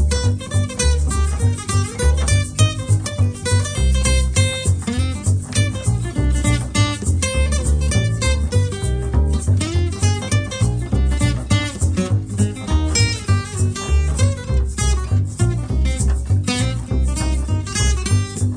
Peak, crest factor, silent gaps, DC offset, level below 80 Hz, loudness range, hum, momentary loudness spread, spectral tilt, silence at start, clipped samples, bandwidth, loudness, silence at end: -4 dBFS; 14 dB; none; under 0.1%; -22 dBFS; 1 LU; none; 4 LU; -5 dB/octave; 0 s; under 0.1%; 10 kHz; -19 LUFS; 0 s